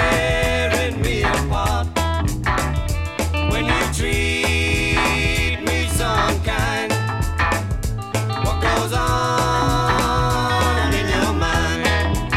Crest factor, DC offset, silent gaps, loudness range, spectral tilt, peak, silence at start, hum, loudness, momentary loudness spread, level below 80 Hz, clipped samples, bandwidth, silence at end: 16 dB; 0.3%; none; 2 LU; -4.5 dB/octave; -4 dBFS; 0 s; none; -19 LUFS; 4 LU; -26 dBFS; under 0.1%; 16 kHz; 0 s